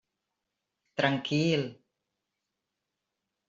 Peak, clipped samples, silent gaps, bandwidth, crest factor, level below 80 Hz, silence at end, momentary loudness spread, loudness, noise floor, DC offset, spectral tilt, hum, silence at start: -10 dBFS; under 0.1%; none; 7.8 kHz; 24 dB; -74 dBFS; 1.75 s; 13 LU; -29 LUFS; -86 dBFS; under 0.1%; -6 dB/octave; none; 0.95 s